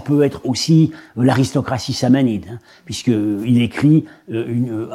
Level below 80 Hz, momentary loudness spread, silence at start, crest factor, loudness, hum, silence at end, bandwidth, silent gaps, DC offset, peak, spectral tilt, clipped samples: -52 dBFS; 11 LU; 0 s; 14 dB; -17 LUFS; none; 0 s; 13.5 kHz; none; under 0.1%; -4 dBFS; -6.5 dB/octave; under 0.1%